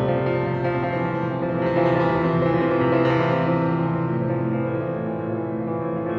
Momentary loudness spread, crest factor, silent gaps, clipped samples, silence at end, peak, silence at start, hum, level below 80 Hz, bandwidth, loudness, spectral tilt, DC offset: 7 LU; 14 dB; none; under 0.1%; 0 s; -8 dBFS; 0 s; none; -50 dBFS; 6 kHz; -22 LUFS; -9.5 dB/octave; under 0.1%